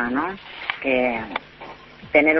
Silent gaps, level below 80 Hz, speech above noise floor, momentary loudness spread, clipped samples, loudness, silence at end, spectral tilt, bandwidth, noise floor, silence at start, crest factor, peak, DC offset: none; -54 dBFS; 20 dB; 20 LU; under 0.1%; -23 LUFS; 0 s; -7 dB/octave; 6 kHz; -41 dBFS; 0 s; 22 dB; -2 dBFS; under 0.1%